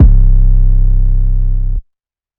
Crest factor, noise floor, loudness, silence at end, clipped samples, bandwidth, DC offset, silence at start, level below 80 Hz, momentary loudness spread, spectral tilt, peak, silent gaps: 8 dB; -72 dBFS; -15 LUFS; 0.55 s; 1%; 1 kHz; under 0.1%; 0 s; -8 dBFS; 9 LU; -13 dB/octave; 0 dBFS; none